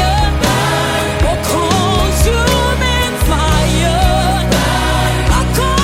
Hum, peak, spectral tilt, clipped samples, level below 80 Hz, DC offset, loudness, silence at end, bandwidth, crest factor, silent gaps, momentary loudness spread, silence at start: none; 0 dBFS; -4.5 dB/octave; under 0.1%; -18 dBFS; under 0.1%; -13 LUFS; 0 s; 16.5 kHz; 12 dB; none; 2 LU; 0 s